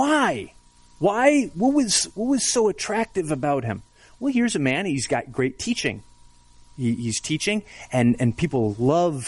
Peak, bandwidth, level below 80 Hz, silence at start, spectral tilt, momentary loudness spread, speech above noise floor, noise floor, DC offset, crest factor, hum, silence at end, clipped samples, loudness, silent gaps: -4 dBFS; 11.5 kHz; -52 dBFS; 0 s; -4.5 dB/octave; 9 LU; 28 dB; -51 dBFS; under 0.1%; 18 dB; 60 Hz at -45 dBFS; 0 s; under 0.1%; -23 LUFS; none